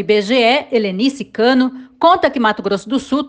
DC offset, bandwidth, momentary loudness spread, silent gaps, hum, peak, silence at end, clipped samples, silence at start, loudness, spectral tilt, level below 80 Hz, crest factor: under 0.1%; 9.2 kHz; 6 LU; none; none; 0 dBFS; 0 s; under 0.1%; 0 s; -15 LUFS; -5 dB/octave; -54 dBFS; 14 dB